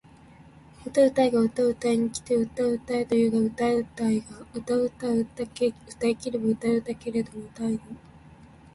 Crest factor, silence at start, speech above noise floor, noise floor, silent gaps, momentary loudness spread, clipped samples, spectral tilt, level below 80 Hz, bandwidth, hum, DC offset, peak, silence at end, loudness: 16 dB; 0.8 s; 26 dB; -51 dBFS; none; 10 LU; under 0.1%; -6 dB/octave; -56 dBFS; 11.5 kHz; none; under 0.1%; -10 dBFS; 0.75 s; -26 LUFS